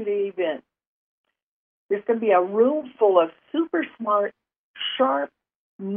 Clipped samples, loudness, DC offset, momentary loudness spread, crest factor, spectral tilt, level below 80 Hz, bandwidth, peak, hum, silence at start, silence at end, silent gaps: under 0.1%; -23 LUFS; under 0.1%; 11 LU; 18 dB; -9 dB/octave; -80 dBFS; 3.7 kHz; -6 dBFS; none; 0 s; 0 s; 0.87-1.24 s, 1.42-1.89 s, 4.58-4.74 s, 5.55-5.79 s